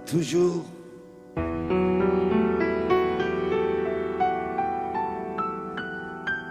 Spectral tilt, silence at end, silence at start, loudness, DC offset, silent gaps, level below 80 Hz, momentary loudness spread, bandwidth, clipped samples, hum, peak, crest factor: -6.5 dB/octave; 0 s; 0 s; -26 LUFS; under 0.1%; none; -48 dBFS; 11 LU; 14 kHz; under 0.1%; none; -10 dBFS; 16 dB